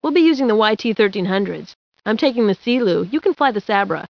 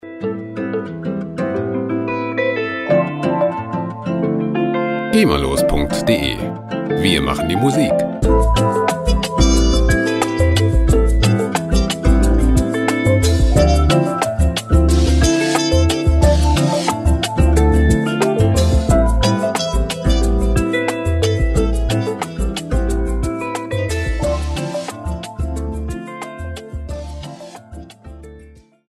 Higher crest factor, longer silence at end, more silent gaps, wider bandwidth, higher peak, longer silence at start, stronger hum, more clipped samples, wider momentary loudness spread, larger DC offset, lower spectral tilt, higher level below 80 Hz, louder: about the same, 16 dB vs 14 dB; second, 0.05 s vs 0.4 s; first, 1.75-1.92 s vs none; second, 5.4 kHz vs 14 kHz; about the same, -2 dBFS vs -2 dBFS; about the same, 0.05 s vs 0.05 s; neither; neither; second, 7 LU vs 11 LU; neither; about the same, -6.5 dB/octave vs -6 dB/octave; second, -66 dBFS vs -20 dBFS; about the same, -18 LUFS vs -17 LUFS